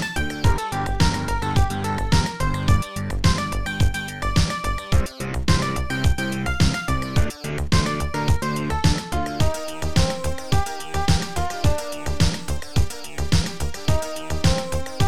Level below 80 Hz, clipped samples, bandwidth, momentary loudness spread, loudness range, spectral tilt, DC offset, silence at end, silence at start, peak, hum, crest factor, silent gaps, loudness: -28 dBFS; under 0.1%; 16.5 kHz; 6 LU; 2 LU; -5 dB/octave; 3%; 0 s; 0 s; -4 dBFS; none; 18 dB; none; -23 LUFS